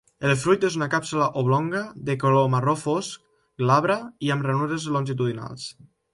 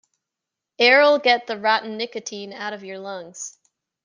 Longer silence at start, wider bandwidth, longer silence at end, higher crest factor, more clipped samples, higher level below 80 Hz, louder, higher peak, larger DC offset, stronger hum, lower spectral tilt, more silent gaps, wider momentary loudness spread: second, 0.2 s vs 0.8 s; first, 11.5 kHz vs 9.8 kHz; second, 0.4 s vs 0.55 s; about the same, 16 dB vs 20 dB; neither; first, -62 dBFS vs -80 dBFS; second, -23 LUFS vs -19 LUFS; second, -6 dBFS vs -2 dBFS; neither; neither; first, -6 dB/octave vs -2 dB/octave; neither; second, 11 LU vs 20 LU